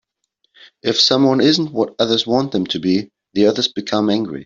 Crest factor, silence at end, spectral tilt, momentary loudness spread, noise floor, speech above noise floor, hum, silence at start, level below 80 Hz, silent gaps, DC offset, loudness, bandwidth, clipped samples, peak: 16 dB; 0 s; -5 dB/octave; 8 LU; -68 dBFS; 52 dB; none; 0.85 s; -58 dBFS; none; under 0.1%; -16 LUFS; 7.6 kHz; under 0.1%; -2 dBFS